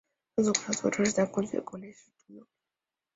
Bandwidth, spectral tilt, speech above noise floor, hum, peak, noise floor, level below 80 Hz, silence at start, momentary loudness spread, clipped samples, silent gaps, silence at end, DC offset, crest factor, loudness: 8 kHz; -4 dB/octave; 60 dB; none; -10 dBFS; -90 dBFS; -68 dBFS; 0.35 s; 17 LU; under 0.1%; none; 0.75 s; under 0.1%; 22 dB; -29 LUFS